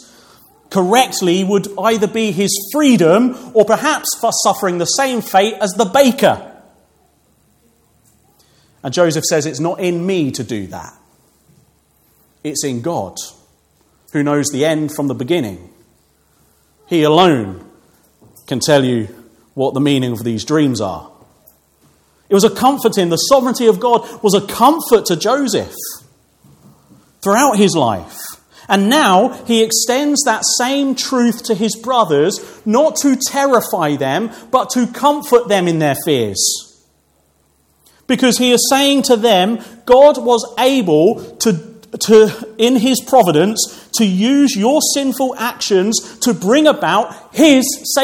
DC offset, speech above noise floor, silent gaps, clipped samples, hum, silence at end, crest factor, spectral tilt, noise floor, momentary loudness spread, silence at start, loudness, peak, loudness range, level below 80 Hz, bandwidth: under 0.1%; 44 dB; none; under 0.1%; none; 0 s; 14 dB; -4 dB/octave; -57 dBFS; 10 LU; 0.7 s; -14 LUFS; 0 dBFS; 7 LU; -56 dBFS; 18 kHz